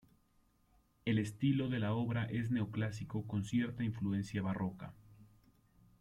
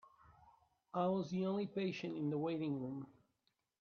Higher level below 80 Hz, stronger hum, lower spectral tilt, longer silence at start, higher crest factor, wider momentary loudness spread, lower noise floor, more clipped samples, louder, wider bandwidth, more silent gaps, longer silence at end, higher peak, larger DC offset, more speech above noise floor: first, -66 dBFS vs -80 dBFS; neither; about the same, -7.5 dB/octave vs -6.5 dB/octave; first, 1.05 s vs 0.05 s; about the same, 16 dB vs 18 dB; about the same, 8 LU vs 9 LU; second, -72 dBFS vs -84 dBFS; neither; first, -37 LUFS vs -41 LUFS; first, 12 kHz vs 6.8 kHz; neither; about the same, 0.75 s vs 0.7 s; about the same, -22 dBFS vs -24 dBFS; neither; second, 36 dB vs 45 dB